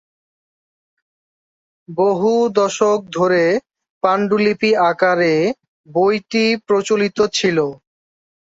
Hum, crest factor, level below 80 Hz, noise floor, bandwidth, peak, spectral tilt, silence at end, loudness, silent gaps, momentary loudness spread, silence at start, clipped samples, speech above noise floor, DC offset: none; 16 dB; -62 dBFS; under -90 dBFS; 8 kHz; -2 dBFS; -4.5 dB/octave; 0.7 s; -17 LUFS; 3.90-4.01 s, 5.68-5.84 s; 6 LU; 1.9 s; under 0.1%; over 74 dB; under 0.1%